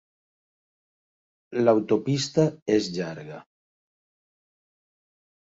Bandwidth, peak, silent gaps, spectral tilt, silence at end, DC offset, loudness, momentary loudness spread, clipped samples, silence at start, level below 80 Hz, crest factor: 8 kHz; -8 dBFS; 2.62-2.66 s; -6 dB/octave; 2 s; under 0.1%; -24 LUFS; 17 LU; under 0.1%; 1.5 s; -68 dBFS; 20 dB